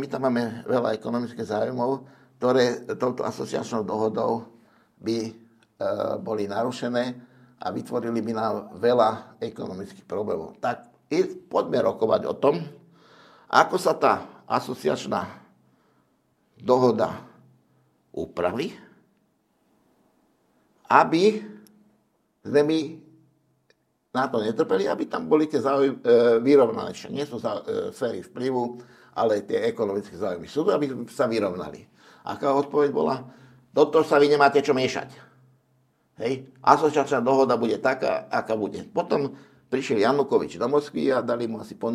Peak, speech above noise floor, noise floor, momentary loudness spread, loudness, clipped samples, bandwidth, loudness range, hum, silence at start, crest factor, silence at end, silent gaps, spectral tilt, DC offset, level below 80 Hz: 0 dBFS; 44 dB; -68 dBFS; 13 LU; -24 LUFS; under 0.1%; 14.5 kHz; 6 LU; none; 0 s; 24 dB; 0 s; none; -6 dB/octave; under 0.1%; -70 dBFS